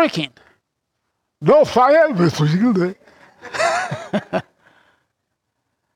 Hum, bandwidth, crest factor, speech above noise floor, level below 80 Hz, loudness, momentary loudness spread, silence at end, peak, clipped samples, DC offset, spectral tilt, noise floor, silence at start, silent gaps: none; 14 kHz; 16 dB; 59 dB; -60 dBFS; -17 LUFS; 13 LU; 1.55 s; -4 dBFS; under 0.1%; under 0.1%; -6 dB/octave; -75 dBFS; 0 s; none